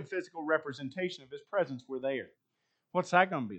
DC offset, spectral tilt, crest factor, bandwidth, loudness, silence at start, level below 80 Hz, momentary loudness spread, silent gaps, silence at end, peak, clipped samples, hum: under 0.1%; -5.5 dB/octave; 24 dB; 8.8 kHz; -33 LUFS; 0 s; -84 dBFS; 12 LU; none; 0 s; -10 dBFS; under 0.1%; none